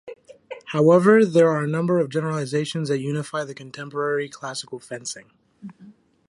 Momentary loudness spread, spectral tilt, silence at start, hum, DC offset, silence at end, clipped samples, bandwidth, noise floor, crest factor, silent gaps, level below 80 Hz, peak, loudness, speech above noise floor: 22 LU; -6 dB/octave; 0.05 s; none; under 0.1%; 0.4 s; under 0.1%; 11.5 kHz; -50 dBFS; 18 dB; none; -70 dBFS; -4 dBFS; -21 LUFS; 29 dB